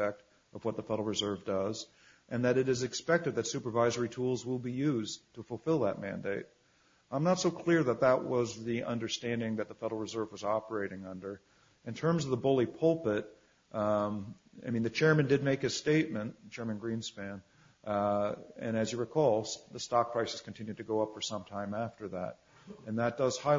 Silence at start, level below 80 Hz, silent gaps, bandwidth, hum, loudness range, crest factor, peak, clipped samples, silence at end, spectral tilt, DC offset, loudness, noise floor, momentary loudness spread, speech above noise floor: 0 s; -70 dBFS; none; 7.6 kHz; none; 5 LU; 20 dB; -14 dBFS; under 0.1%; 0 s; -5.5 dB/octave; under 0.1%; -33 LUFS; -68 dBFS; 14 LU; 36 dB